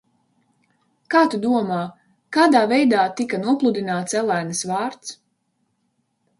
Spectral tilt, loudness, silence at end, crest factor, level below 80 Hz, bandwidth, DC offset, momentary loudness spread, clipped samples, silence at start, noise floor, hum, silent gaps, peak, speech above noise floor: -4.5 dB/octave; -20 LUFS; 1.25 s; 18 dB; -70 dBFS; 11.5 kHz; under 0.1%; 11 LU; under 0.1%; 1.1 s; -70 dBFS; none; none; -2 dBFS; 51 dB